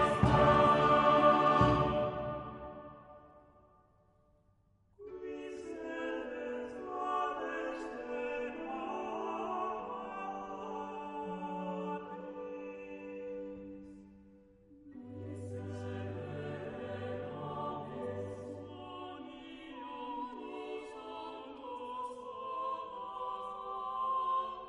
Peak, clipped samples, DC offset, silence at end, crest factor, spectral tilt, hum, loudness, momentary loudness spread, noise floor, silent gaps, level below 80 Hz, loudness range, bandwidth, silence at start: -14 dBFS; under 0.1%; under 0.1%; 0 s; 22 dB; -7 dB/octave; none; -35 LUFS; 20 LU; -70 dBFS; none; -56 dBFS; 14 LU; 11 kHz; 0 s